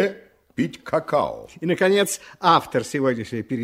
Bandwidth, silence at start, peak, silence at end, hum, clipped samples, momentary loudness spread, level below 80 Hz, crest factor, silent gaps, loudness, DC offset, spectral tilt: 16 kHz; 0 s; -4 dBFS; 0 s; none; under 0.1%; 10 LU; -60 dBFS; 20 dB; none; -22 LUFS; under 0.1%; -4.5 dB/octave